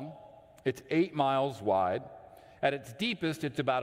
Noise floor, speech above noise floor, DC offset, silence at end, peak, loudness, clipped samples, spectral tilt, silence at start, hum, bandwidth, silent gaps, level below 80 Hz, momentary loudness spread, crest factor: -54 dBFS; 23 dB; under 0.1%; 0 s; -14 dBFS; -31 LUFS; under 0.1%; -6 dB/octave; 0 s; none; 16 kHz; none; -70 dBFS; 16 LU; 18 dB